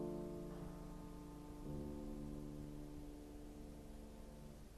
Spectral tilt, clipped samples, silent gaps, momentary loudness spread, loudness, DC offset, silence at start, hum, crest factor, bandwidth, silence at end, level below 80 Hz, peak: -7 dB/octave; under 0.1%; none; 8 LU; -53 LUFS; under 0.1%; 0 s; none; 16 dB; 13 kHz; 0 s; -56 dBFS; -36 dBFS